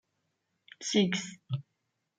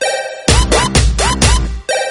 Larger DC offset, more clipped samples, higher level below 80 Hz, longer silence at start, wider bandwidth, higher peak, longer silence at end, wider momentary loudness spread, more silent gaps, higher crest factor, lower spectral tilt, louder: neither; second, under 0.1% vs 0.1%; second, -74 dBFS vs -16 dBFS; first, 0.8 s vs 0 s; second, 9.4 kHz vs 12 kHz; second, -14 dBFS vs 0 dBFS; first, 0.55 s vs 0 s; first, 12 LU vs 6 LU; neither; first, 20 dB vs 12 dB; about the same, -4.5 dB/octave vs -3.5 dB/octave; second, -32 LUFS vs -13 LUFS